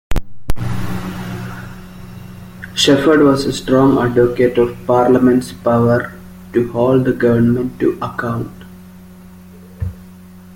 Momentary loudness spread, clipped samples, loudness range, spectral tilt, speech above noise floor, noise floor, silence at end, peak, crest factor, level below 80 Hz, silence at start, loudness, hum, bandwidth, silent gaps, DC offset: 20 LU; under 0.1%; 6 LU; -6 dB/octave; 25 dB; -38 dBFS; 0.05 s; 0 dBFS; 16 dB; -32 dBFS; 0.1 s; -15 LUFS; none; 17 kHz; none; under 0.1%